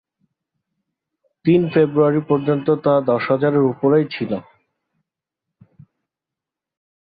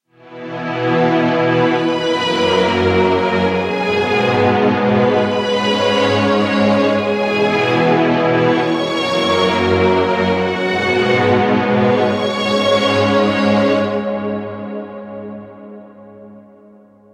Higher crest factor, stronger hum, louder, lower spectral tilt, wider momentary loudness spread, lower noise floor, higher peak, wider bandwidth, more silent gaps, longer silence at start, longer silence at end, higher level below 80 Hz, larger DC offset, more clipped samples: about the same, 16 dB vs 14 dB; neither; second, -18 LUFS vs -15 LUFS; first, -11.5 dB/octave vs -6 dB/octave; about the same, 8 LU vs 9 LU; first, -86 dBFS vs -45 dBFS; second, -4 dBFS vs 0 dBFS; second, 5 kHz vs 11.5 kHz; neither; first, 1.45 s vs 0.25 s; first, 2.7 s vs 0.75 s; second, -62 dBFS vs -50 dBFS; neither; neither